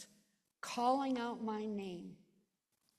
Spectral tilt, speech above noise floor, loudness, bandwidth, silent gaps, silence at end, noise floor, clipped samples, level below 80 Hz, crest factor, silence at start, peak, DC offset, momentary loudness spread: -5 dB/octave; 44 dB; -39 LUFS; 13.5 kHz; none; 0.85 s; -82 dBFS; under 0.1%; -82 dBFS; 18 dB; 0 s; -22 dBFS; under 0.1%; 17 LU